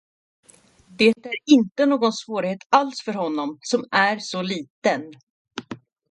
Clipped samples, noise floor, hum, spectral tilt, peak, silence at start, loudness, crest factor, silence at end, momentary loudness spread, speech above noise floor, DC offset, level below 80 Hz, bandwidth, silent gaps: under 0.1%; -53 dBFS; none; -4.5 dB/octave; -2 dBFS; 1 s; -21 LUFS; 20 dB; 0.35 s; 18 LU; 32 dB; under 0.1%; -70 dBFS; 11.5 kHz; 2.66-2.70 s, 4.70-4.82 s, 5.23-5.45 s